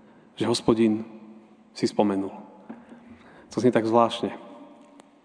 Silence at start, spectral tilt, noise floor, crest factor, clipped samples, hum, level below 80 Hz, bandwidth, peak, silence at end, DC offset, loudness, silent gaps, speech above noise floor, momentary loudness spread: 0.4 s; -5.5 dB/octave; -52 dBFS; 20 dB; under 0.1%; none; -62 dBFS; 10 kHz; -6 dBFS; 0.6 s; under 0.1%; -24 LUFS; none; 29 dB; 24 LU